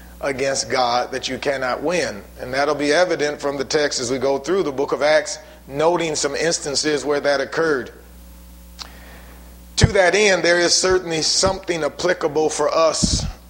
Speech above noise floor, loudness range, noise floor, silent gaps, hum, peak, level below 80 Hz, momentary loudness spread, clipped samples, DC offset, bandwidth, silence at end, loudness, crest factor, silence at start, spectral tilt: 22 dB; 5 LU; -41 dBFS; none; none; 0 dBFS; -40 dBFS; 11 LU; under 0.1%; under 0.1%; 16.5 kHz; 0 s; -19 LUFS; 20 dB; 0 s; -3 dB/octave